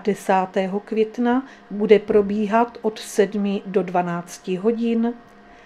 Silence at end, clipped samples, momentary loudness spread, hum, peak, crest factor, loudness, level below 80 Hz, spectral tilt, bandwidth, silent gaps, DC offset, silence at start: 0.5 s; under 0.1%; 10 LU; none; 0 dBFS; 20 dB; -21 LUFS; -58 dBFS; -6 dB/octave; 13.5 kHz; none; under 0.1%; 0 s